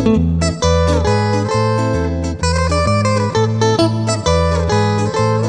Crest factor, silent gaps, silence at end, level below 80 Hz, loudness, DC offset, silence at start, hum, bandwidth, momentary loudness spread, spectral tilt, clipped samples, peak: 14 dB; none; 0 s; -26 dBFS; -15 LUFS; under 0.1%; 0 s; none; 10 kHz; 3 LU; -6 dB/octave; under 0.1%; 0 dBFS